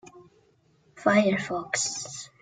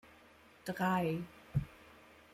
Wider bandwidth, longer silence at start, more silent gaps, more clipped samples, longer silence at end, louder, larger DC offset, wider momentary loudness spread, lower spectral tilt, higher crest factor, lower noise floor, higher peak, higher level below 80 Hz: second, 9.6 kHz vs 15.5 kHz; about the same, 0.05 s vs 0.05 s; neither; neither; second, 0.15 s vs 0.4 s; first, -26 LUFS vs -37 LUFS; neither; second, 11 LU vs 25 LU; second, -3.5 dB/octave vs -7 dB/octave; about the same, 20 dB vs 18 dB; about the same, -64 dBFS vs -62 dBFS; first, -8 dBFS vs -22 dBFS; second, -68 dBFS vs -60 dBFS